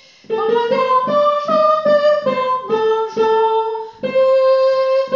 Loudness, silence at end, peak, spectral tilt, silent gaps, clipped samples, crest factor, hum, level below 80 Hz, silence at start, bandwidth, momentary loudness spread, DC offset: -15 LUFS; 0 s; -4 dBFS; -5.5 dB/octave; none; under 0.1%; 12 dB; none; -66 dBFS; 0.3 s; 7.2 kHz; 6 LU; under 0.1%